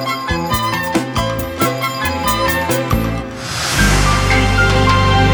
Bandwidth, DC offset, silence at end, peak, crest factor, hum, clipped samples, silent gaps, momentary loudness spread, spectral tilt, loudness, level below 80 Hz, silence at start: over 20 kHz; under 0.1%; 0 s; -2 dBFS; 14 dB; none; under 0.1%; none; 7 LU; -4.5 dB/octave; -15 LUFS; -24 dBFS; 0 s